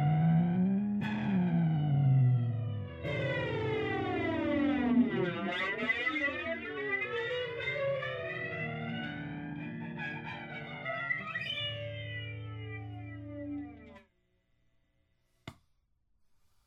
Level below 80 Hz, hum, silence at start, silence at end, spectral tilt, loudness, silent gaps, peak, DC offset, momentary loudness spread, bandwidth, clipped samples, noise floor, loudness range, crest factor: -62 dBFS; none; 0 s; 1.15 s; -8.5 dB/octave; -33 LUFS; none; -16 dBFS; under 0.1%; 14 LU; 7.2 kHz; under 0.1%; -74 dBFS; 14 LU; 16 dB